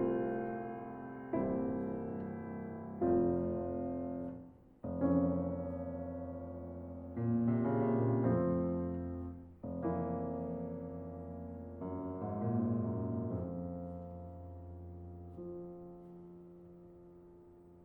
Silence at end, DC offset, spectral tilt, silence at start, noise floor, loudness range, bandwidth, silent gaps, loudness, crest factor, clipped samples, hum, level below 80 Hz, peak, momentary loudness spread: 0 s; under 0.1%; -12.5 dB/octave; 0 s; -58 dBFS; 11 LU; 3.2 kHz; none; -38 LUFS; 18 dB; under 0.1%; none; -64 dBFS; -20 dBFS; 19 LU